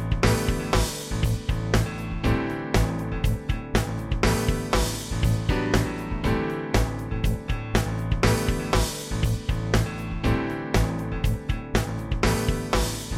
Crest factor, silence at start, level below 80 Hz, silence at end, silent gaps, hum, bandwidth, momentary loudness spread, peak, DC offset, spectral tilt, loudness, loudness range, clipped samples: 18 dB; 0 s; -30 dBFS; 0 s; none; none; 16 kHz; 5 LU; -6 dBFS; under 0.1%; -5.5 dB/octave; -26 LUFS; 1 LU; under 0.1%